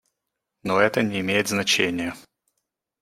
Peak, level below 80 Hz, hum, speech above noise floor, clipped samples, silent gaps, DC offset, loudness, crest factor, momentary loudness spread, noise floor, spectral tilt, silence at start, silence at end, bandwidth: -4 dBFS; -64 dBFS; none; 59 dB; under 0.1%; none; under 0.1%; -22 LUFS; 22 dB; 10 LU; -82 dBFS; -3.5 dB/octave; 0.65 s; 0.8 s; 16 kHz